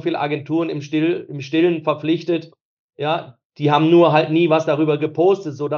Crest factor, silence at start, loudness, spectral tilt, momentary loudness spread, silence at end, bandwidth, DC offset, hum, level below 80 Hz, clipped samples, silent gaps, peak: 16 dB; 0.05 s; -18 LUFS; -7.5 dB/octave; 10 LU; 0 s; 6.8 kHz; under 0.1%; none; -80 dBFS; under 0.1%; 2.61-2.89 s, 3.45-3.50 s; -2 dBFS